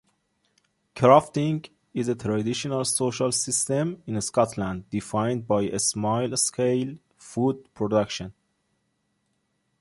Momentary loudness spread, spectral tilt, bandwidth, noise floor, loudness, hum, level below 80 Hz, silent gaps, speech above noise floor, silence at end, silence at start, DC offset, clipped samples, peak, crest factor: 10 LU; -4.5 dB/octave; 12 kHz; -73 dBFS; -25 LUFS; none; -58 dBFS; none; 49 dB; 1.5 s; 0.95 s; under 0.1%; under 0.1%; -4 dBFS; 22 dB